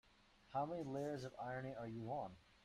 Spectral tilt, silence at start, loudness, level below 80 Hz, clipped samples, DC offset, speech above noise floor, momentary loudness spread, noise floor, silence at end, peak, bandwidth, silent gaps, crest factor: -7 dB/octave; 0.45 s; -47 LUFS; -74 dBFS; under 0.1%; under 0.1%; 24 dB; 5 LU; -71 dBFS; 0.15 s; -32 dBFS; 14 kHz; none; 16 dB